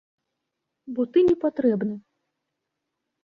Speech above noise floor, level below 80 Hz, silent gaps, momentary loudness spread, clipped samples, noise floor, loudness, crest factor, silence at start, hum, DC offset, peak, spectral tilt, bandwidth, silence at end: 59 dB; -62 dBFS; none; 14 LU; under 0.1%; -82 dBFS; -23 LUFS; 16 dB; 0.85 s; none; under 0.1%; -10 dBFS; -9 dB/octave; 5.4 kHz; 1.25 s